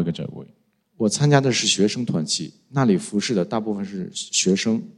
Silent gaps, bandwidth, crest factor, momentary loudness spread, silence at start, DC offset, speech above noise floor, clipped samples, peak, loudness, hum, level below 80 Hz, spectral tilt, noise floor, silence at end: none; 11.5 kHz; 22 dB; 12 LU; 0 s; under 0.1%; 38 dB; under 0.1%; 0 dBFS; -21 LUFS; none; -62 dBFS; -4.5 dB/octave; -59 dBFS; 0.05 s